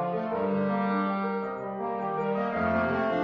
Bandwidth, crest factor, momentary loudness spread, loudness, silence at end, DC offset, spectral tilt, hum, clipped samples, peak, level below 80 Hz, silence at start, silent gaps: 5.8 kHz; 12 dB; 6 LU; -29 LUFS; 0 s; under 0.1%; -9 dB/octave; none; under 0.1%; -16 dBFS; -62 dBFS; 0 s; none